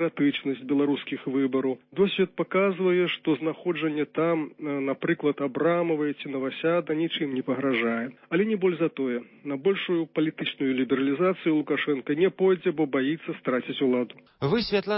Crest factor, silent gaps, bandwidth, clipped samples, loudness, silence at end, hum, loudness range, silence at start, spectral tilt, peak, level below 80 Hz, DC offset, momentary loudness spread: 16 dB; none; 5.8 kHz; under 0.1%; -26 LUFS; 0 s; none; 2 LU; 0 s; -10.5 dB/octave; -10 dBFS; -66 dBFS; under 0.1%; 6 LU